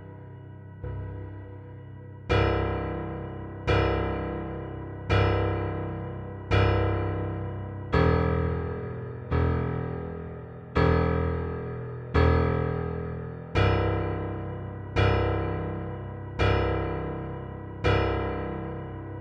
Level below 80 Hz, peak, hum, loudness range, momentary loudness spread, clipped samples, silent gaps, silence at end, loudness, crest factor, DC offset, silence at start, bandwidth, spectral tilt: -36 dBFS; -10 dBFS; none; 2 LU; 14 LU; under 0.1%; none; 0 s; -28 LUFS; 18 dB; under 0.1%; 0 s; 6.6 kHz; -8 dB/octave